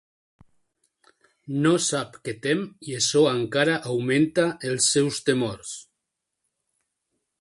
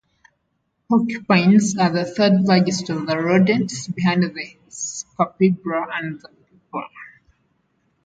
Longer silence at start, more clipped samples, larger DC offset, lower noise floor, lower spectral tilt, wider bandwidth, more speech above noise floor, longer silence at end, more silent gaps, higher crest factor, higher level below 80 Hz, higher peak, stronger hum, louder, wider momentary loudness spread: first, 1.45 s vs 0.9 s; neither; neither; first, -82 dBFS vs -71 dBFS; second, -4 dB/octave vs -5.5 dB/octave; first, 11.5 kHz vs 9.2 kHz; first, 59 dB vs 52 dB; first, 1.6 s vs 1 s; neither; about the same, 20 dB vs 18 dB; about the same, -64 dBFS vs -62 dBFS; second, -6 dBFS vs -2 dBFS; neither; second, -23 LUFS vs -19 LUFS; second, 12 LU vs 16 LU